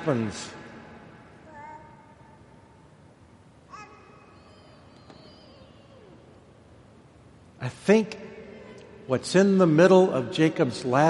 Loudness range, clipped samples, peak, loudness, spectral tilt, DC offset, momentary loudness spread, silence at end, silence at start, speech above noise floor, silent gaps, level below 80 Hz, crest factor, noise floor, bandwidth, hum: 26 LU; under 0.1%; -6 dBFS; -22 LUFS; -6.5 dB/octave; under 0.1%; 28 LU; 0 s; 0 s; 32 dB; none; -64 dBFS; 22 dB; -54 dBFS; 11.5 kHz; none